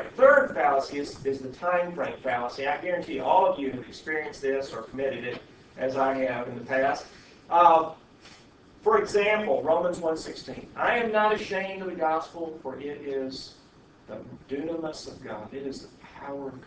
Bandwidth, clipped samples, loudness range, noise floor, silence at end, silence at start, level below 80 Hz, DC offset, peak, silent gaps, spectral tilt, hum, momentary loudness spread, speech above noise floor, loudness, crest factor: 8 kHz; under 0.1%; 11 LU; -55 dBFS; 0.05 s; 0 s; -60 dBFS; under 0.1%; -6 dBFS; none; -5 dB/octave; none; 17 LU; 27 dB; -27 LUFS; 22 dB